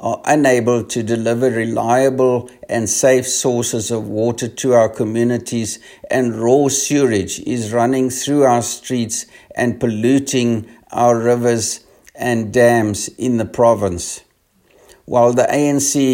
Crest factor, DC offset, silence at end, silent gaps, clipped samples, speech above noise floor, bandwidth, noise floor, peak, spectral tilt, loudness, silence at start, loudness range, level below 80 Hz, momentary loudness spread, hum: 16 dB; under 0.1%; 0 s; none; under 0.1%; 41 dB; 16.5 kHz; -57 dBFS; 0 dBFS; -4.5 dB/octave; -16 LUFS; 0 s; 2 LU; -54 dBFS; 9 LU; none